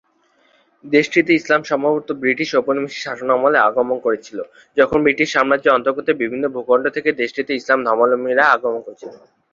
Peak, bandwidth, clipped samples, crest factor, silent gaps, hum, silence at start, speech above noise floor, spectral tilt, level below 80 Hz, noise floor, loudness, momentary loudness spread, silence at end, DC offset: -2 dBFS; 7.6 kHz; under 0.1%; 16 dB; none; none; 0.85 s; 42 dB; -5 dB/octave; -58 dBFS; -59 dBFS; -17 LUFS; 10 LU; 0.35 s; under 0.1%